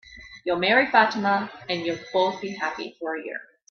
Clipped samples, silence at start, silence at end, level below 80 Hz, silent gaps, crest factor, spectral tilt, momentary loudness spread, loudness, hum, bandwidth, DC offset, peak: under 0.1%; 0.05 s; 0.25 s; -62 dBFS; none; 22 dB; -4.5 dB/octave; 15 LU; -24 LUFS; none; 6.8 kHz; under 0.1%; -4 dBFS